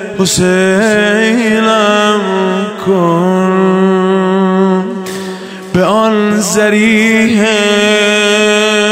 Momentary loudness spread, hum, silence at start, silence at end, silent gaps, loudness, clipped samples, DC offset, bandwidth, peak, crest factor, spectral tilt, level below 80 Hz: 6 LU; none; 0 s; 0 s; none; -10 LUFS; under 0.1%; under 0.1%; 16 kHz; 0 dBFS; 10 dB; -4.5 dB/octave; -46 dBFS